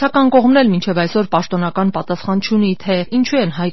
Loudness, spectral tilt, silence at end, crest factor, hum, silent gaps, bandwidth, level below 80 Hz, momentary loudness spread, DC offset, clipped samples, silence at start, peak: -15 LUFS; -5 dB/octave; 0 s; 14 dB; none; none; 6.2 kHz; -54 dBFS; 7 LU; 3%; under 0.1%; 0 s; 0 dBFS